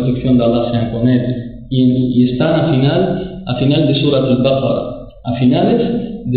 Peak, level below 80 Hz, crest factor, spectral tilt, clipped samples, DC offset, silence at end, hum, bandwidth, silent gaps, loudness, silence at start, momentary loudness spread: -2 dBFS; -38 dBFS; 10 dB; -13 dB/octave; under 0.1%; 0.5%; 0 s; none; 4.7 kHz; none; -14 LUFS; 0 s; 9 LU